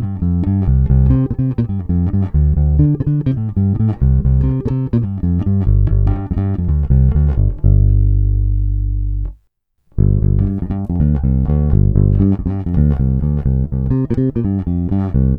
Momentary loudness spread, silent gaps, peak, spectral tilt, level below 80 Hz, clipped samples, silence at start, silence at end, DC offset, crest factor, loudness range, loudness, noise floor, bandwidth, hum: 5 LU; none; 0 dBFS; -13 dB/octave; -18 dBFS; under 0.1%; 0 s; 0 s; under 0.1%; 14 dB; 2 LU; -16 LUFS; -61 dBFS; 2.6 kHz; 50 Hz at -25 dBFS